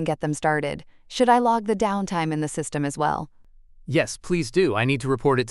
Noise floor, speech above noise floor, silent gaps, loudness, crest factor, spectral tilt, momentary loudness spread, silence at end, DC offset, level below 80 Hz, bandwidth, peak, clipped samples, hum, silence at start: -49 dBFS; 27 dB; none; -23 LUFS; 18 dB; -5.5 dB/octave; 9 LU; 0 s; under 0.1%; -50 dBFS; 12 kHz; -6 dBFS; under 0.1%; none; 0 s